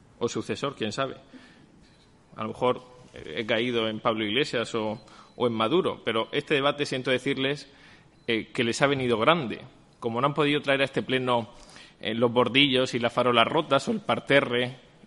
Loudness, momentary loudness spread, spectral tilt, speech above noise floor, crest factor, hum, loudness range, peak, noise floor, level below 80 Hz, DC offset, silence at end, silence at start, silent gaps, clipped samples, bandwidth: -26 LUFS; 13 LU; -5 dB/octave; 31 dB; 22 dB; none; 7 LU; -4 dBFS; -57 dBFS; -62 dBFS; under 0.1%; 0.3 s; 0.2 s; none; under 0.1%; 11.5 kHz